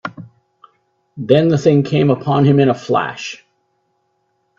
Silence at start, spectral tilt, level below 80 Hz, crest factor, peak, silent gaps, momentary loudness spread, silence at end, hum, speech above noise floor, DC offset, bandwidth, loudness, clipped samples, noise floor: 0.05 s; -7.5 dB/octave; -56 dBFS; 16 dB; 0 dBFS; none; 17 LU; 1.25 s; none; 52 dB; under 0.1%; 7.4 kHz; -14 LUFS; under 0.1%; -66 dBFS